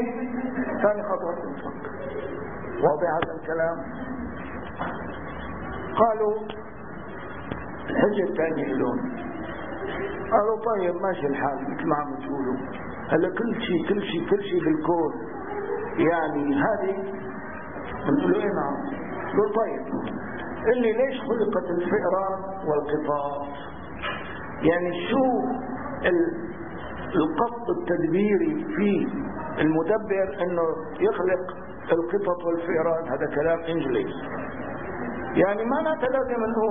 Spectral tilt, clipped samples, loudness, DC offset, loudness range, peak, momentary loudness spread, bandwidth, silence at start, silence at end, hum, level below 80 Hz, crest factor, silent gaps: -11 dB/octave; under 0.1%; -26 LUFS; 0.8%; 3 LU; -6 dBFS; 12 LU; 3.7 kHz; 0 s; 0 s; none; -50 dBFS; 20 dB; none